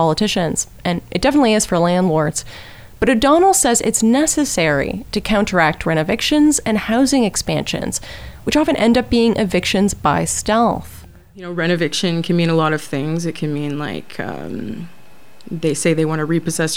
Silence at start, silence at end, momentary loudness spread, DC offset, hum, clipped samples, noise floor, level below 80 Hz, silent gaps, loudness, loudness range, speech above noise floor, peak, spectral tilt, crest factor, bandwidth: 0 s; 0 s; 13 LU; under 0.1%; none; under 0.1%; -48 dBFS; -40 dBFS; none; -17 LUFS; 6 LU; 31 dB; -2 dBFS; -4.5 dB/octave; 16 dB; over 20 kHz